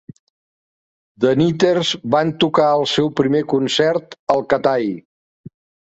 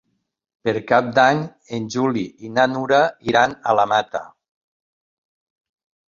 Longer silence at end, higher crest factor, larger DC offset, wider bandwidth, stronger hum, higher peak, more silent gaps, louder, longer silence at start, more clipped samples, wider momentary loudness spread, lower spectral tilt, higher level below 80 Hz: second, 0.85 s vs 1.85 s; about the same, 16 dB vs 20 dB; neither; first, 8.2 kHz vs 7.4 kHz; neither; about the same, -2 dBFS vs -2 dBFS; first, 4.19-4.27 s vs none; about the same, -17 LUFS vs -19 LUFS; first, 1.2 s vs 0.65 s; neither; second, 5 LU vs 11 LU; about the same, -5.5 dB/octave vs -5 dB/octave; about the same, -58 dBFS vs -60 dBFS